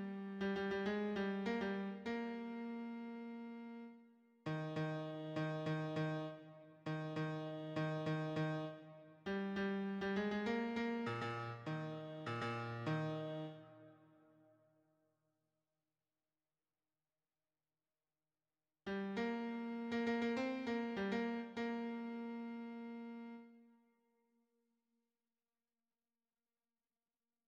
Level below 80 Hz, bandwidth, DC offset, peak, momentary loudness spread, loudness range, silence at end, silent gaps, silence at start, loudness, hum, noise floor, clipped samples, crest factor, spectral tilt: -78 dBFS; 9.2 kHz; under 0.1%; -28 dBFS; 11 LU; 10 LU; 3.8 s; none; 0 s; -43 LUFS; none; under -90 dBFS; under 0.1%; 16 dB; -7.5 dB/octave